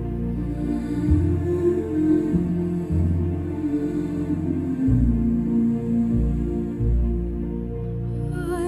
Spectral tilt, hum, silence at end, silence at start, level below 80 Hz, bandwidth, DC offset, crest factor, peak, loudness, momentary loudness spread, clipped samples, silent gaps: -10 dB/octave; none; 0 s; 0 s; -30 dBFS; 11.5 kHz; under 0.1%; 14 dB; -8 dBFS; -24 LUFS; 7 LU; under 0.1%; none